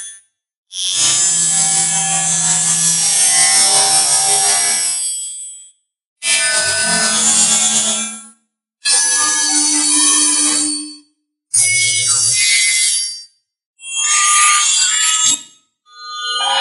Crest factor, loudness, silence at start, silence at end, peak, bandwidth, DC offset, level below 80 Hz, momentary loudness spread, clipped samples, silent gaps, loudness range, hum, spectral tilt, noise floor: 16 dB; -11 LUFS; 0 s; 0 s; 0 dBFS; 11.5 kHz; under 0.1%; -68 dBFS; 13 LU; under 0.1%; 0.57-0.63 s, 6.07-6.16 s, 13.66-13.74 s; 3 LU; none; 1 dB/octave; -62 dBFS